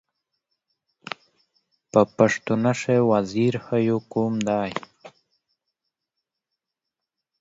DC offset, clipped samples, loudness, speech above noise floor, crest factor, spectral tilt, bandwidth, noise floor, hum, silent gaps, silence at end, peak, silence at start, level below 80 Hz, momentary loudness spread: under 0.1%; under 0.1%; -22 LUFS; 64 dB; 24 dB; -6.5 dB/octave; 8 kHz; -85 dBFS; none; none; 2.3 s; -2 dBFS; 1.95 s; -64 dBFS; 16 LU